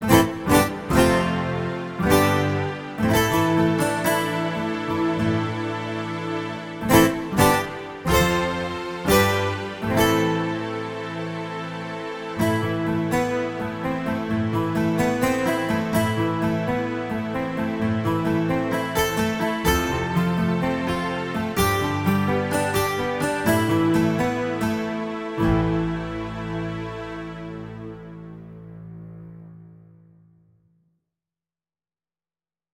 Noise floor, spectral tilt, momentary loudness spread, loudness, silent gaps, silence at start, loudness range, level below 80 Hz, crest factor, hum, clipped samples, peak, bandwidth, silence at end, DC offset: under -90 dBFS; -5.5 dB/octave; 12 LU; -23 LUFS; none; 0 s; 6 LU; -42 dBFS; 20 dB; none; under 0.1%; -2 dBFS; 18 kHz; 3 s; under 0.1%